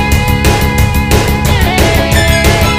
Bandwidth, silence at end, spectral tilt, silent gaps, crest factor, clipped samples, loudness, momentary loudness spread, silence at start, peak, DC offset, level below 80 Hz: 16 kHz; 0 s; -4.5 dB/octave; none; 8 dB; 0.5%; -10 LUFS; 2 LU; 0 s; 0 dBFS; under 0.1%; -14 dBFS